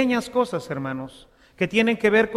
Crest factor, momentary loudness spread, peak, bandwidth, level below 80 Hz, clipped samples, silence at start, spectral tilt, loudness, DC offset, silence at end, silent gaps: 18 dB; 13 LU; -6 dBFS; 14 kHz; -56 dBFS; under 0.1%; 0 s; -5.5 dB/octave; -23 LUFS; under 0.1%; 0 s; none